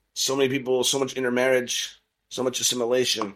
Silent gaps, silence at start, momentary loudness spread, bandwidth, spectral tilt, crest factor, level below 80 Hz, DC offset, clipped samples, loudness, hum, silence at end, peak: none; 0.15 s; 6 LU; 16 kHz; -2 dB/octave; 16 dB; -68 dBFS; under 0.1%; under 0.1%; -23 LUFS; none; 0 s; -10 dBFS